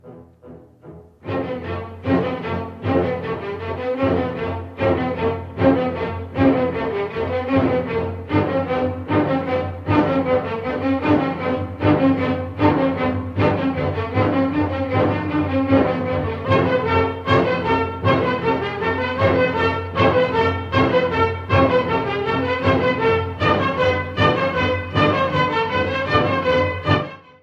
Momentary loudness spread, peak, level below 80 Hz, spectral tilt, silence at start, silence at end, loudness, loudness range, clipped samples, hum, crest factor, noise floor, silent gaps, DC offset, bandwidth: 7 LU; -4 dBFS; -46 dBFS; -8 dB/octave; 0.05 s; 0.25 s; -20 LUFS; 4 LU; under 0.1%; none; 16 dB; -43 dBFS; none; under 0.1%; 7.4 kHz